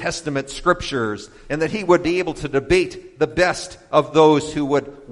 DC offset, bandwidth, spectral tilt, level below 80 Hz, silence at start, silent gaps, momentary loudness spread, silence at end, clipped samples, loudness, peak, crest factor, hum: under 0.1%; 11.5 kHz; -5 dB/octave; -42 dBFS; 0 s; none; 11 LU; 0 s; under 0.1%; -20 LUFS; 0 dBFS; 18 dB; none